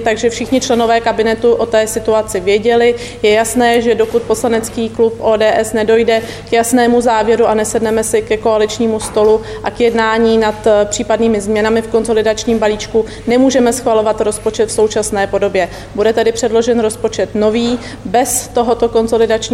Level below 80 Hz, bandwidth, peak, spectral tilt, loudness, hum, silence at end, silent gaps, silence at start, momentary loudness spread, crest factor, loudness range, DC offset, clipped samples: -38 dBFS; 16 kHz; -2 dBFS; -4 dB/octave; -13 LUFS; none; 0 s; none; 0 s; 5 LU; 12 dB; 2 LU; 0.2%; under 0.1%